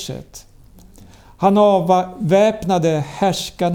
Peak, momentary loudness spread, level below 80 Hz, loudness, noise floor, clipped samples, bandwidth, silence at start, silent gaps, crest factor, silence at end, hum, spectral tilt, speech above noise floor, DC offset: -2 dBFS; 7 LU; -48 dBFS; -16 LUFS; -44 dBFS; under 0.1%; 18 kHz; 0 s; none; 14 dB; 0 s; none; -6 dB/octave; 28 dB; under 0.1%